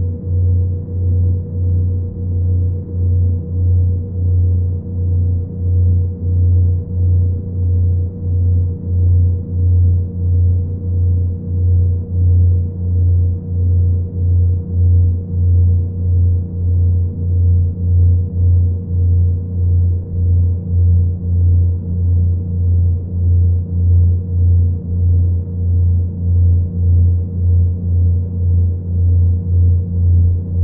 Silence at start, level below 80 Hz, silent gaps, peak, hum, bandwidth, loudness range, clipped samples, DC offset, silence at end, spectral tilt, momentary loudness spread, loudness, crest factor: 0 s; -30 dBFS; none; -4 dBFS; none; 1 kHz; 2 LU; under 0.1%; under 0.1%; 0 s; -17.5 dB/octave; 5 LU; -16 LUFS; 8 dB